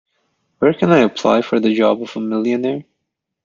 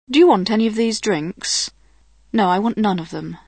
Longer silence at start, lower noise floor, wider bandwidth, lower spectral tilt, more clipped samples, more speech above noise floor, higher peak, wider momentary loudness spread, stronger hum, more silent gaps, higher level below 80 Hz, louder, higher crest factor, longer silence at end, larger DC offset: first, 0.6 s vs 0.1 s; first, -77 dBFS vs -54 dBFS; second, 7.6 kHz vs 9.4 kHz; first, -6.5 dB/octave vs -4.5 dB/octave; neither; first, 61 dB vs 37 dB; about the same, -2 dBFS vs -2 dBFS; second, 8 LU vs 11 LU; neither; neither; about the same, -58 dBFS vs -54 dBFS; about the same, -16 LUFS vs -18 LUFS; about the same, 16 dB vs 16 dB; first, 0.65 s vs 0.1 s; second, under 0.1% vs 0.2%